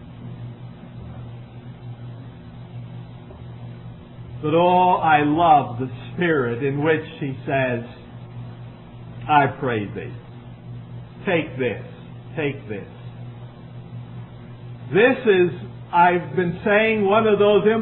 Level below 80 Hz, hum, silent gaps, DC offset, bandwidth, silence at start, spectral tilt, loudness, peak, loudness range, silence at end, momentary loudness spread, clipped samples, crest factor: -52 dBFS; 60 Hz at -45 dBFS; none; under 0.1%; 4.2 kHz; 0 s; -10.5 dB/octave; -20 LUFS; -2 dBFS; 17 LU; 0 s; 23 LU; under 0.1%; 20 dB